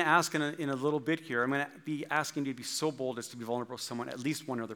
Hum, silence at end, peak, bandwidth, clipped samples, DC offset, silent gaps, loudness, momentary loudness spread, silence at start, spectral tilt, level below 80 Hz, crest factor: none; 0 s; -10 dBFS; 19 kHz; under 0.1%; under 0.1%; none; -33 LUFS; 7 LU; 0 s; -4 dB/octave; -88 dBFS; 22 dB